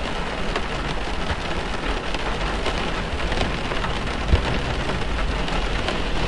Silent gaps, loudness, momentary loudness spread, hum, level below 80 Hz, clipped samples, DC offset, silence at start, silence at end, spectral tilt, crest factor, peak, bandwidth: none; -25 LUFS; 4 LU; none; -28 dBFS; under 0.1%; under 0.1%; 0 s; 0 s; -5 dB/octave; 18 dB; -6 dBFS; 11.5 kHz